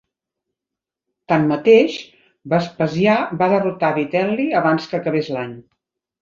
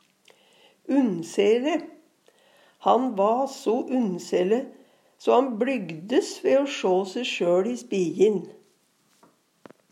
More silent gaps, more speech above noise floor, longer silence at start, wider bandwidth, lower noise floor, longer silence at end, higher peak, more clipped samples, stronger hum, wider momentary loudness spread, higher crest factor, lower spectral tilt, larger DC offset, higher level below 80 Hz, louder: neither; first, 68 dB vs 42 dB; first, 1.3 s vs 0.85 s; second, 7.4 kHz vs 13.5 kHz; first, -86 dBFS vs -65 dBFS; second, 0.6 s vs 1.4 s; first, -2 dBFS vs -6 dBFS; neither; neither; about the same, 9 LU vs 8 LU; about the same, 18 dB vs 20 dB; first, -7 dB/octave vs -5.5 dB/octave; neither; first, -62 dBFS vs -88 dBFS; first, -18 LUFS vs -24 LUFS